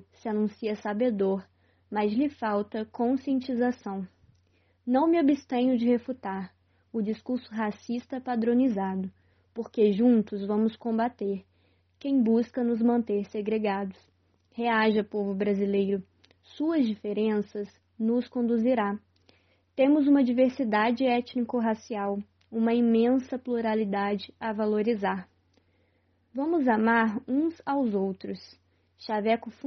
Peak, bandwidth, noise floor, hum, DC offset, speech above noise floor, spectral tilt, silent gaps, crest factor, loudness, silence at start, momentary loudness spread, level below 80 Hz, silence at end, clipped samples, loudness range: -12 dBFS; 6.4 kHz; -69 dBFS; none; under 0.1%; 42 dB; -5.5 dB/octave; none; 16 dB; -27 LUFS; 0.25 s; 13 LU; -74 dBFS; 0 s; under 0.1%; 4 LU